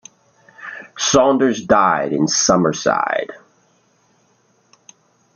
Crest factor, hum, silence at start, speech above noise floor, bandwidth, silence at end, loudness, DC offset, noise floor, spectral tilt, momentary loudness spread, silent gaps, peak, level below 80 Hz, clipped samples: 18 dB; none; 0.6 s; 43 dB; 10 kHz; 2 s; -16 LUFS; under 0.1%; -59 dBFS; -3.5 dB/octave; 19 LU; none; -2 dBFS; -54 dBFS; under 0.1%